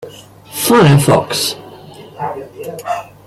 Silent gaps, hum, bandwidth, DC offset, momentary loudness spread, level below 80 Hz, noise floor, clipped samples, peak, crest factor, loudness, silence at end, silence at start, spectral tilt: none; none; 15.5 kHz; under 0.1%; 19 LU; -48 dBFS; -36 dBFS; under 0.1%; 0 dBFS; 14 dB; -13 LUFS; 0.2 s; 0 s; -5 dB/octave